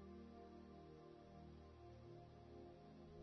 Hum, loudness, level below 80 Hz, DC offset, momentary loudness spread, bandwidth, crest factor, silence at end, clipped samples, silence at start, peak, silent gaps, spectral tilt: none; -62 LUFS; -70 dBFS; under 0.1%; 2 LU; 6.2 kHz; 12 dB; 0 s; under 0.1%; 0 s; -48 dBFS; none; -7 dB/octave